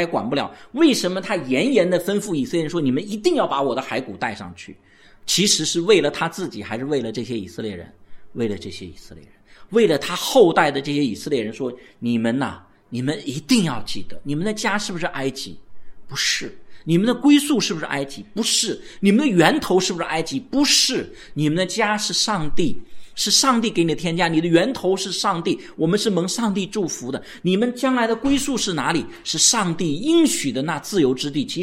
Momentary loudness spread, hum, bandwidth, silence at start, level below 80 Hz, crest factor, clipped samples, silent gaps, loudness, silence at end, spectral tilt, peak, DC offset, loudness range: 14 LU; none; 16 kHz; 0 s; -48 dBFS; 20 dB; under 0.1%; none; -20 LUFS; 0 s; -3.5 dB/octave; 0 dBFS; under 0.1%; 5 LU